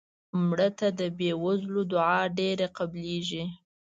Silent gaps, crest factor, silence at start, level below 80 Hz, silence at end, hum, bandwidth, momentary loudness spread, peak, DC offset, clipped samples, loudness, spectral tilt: none; 16 dB; 0.35 s; -66 dBFS; 0.25 s; none; 7.8 kHz; 8 LU; -12 dBFS; under 0.1%; under 0.1%; -28 LUFS; -6 dB/octave